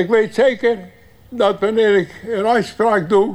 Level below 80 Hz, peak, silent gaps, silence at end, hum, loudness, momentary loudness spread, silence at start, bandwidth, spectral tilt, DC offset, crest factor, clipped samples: -54 dBFS; -4 dBFS; none; 0 s; none; -17 LUFS; 7 LU; 0 s; 11.5 kHz; -6 dB/octave; under 0.1%; 14 dB; under 0.1%